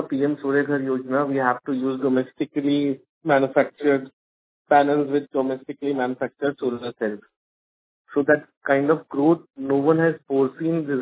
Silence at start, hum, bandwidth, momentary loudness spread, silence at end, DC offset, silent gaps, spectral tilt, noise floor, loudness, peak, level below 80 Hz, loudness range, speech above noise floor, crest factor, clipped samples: 0 s; none; 4 kHz; 8 LU; 0 s; under 0.1%; 3.09-3.21 s, 4.13-4.65 s, 7.36-8.05 s, 8.57-8.61 s; -11 dB/octave; under -90 dBFS; -22 LUFS; -2 dBFS; -72 dBFS; 4 LU; over 68 dB; 20 dB; under 0.1%